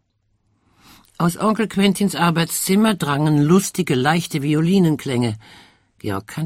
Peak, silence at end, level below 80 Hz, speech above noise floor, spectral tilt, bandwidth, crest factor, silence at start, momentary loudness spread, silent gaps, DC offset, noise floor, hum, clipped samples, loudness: -4 dBFS; 0 s; -54 dBFS; 48 dB; -5.5 dB/octave; 16 kHz; 16 dB; 1.2 s; 9 LU; none; under 0.1%; -66 dBFS; none; under 0.1%; -18 LUFS